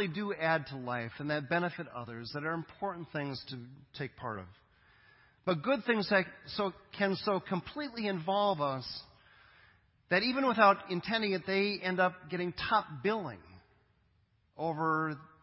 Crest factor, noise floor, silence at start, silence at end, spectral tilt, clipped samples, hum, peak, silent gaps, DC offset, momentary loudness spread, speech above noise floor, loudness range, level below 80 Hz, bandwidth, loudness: 24 dB; -72 dBFS; 0 s; 0.15 s; -9 dB/octave; under 0.1%; none; -10 dBFS; none; under 0.1%; 13 LU; 38 dB; 8 LU; -68 dBFS; 5.8 kHz; -33 LUFS